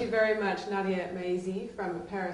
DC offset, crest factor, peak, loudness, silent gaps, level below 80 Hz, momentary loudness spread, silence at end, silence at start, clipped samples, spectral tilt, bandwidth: under 0.1%; 18 dB; -14 dBFS; -31 LUFS; none; -62 dBFS; 9 LU; 0 s; 0 s; under 0.1%; -6 dB/octave; 11.5 kHz